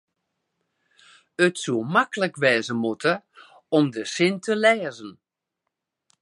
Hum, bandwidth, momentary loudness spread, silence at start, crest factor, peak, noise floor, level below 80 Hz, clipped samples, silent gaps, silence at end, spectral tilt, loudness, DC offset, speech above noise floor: none; 11.5 kHz; 11 LU; 1.4 s; 20 dB; -4 dBFS; -82 dBFS; -74 dBFS; under 0.1%; none; 1.1 s; -4.5 dB/octave; -23 LUFS; under 0.1%; 60 dB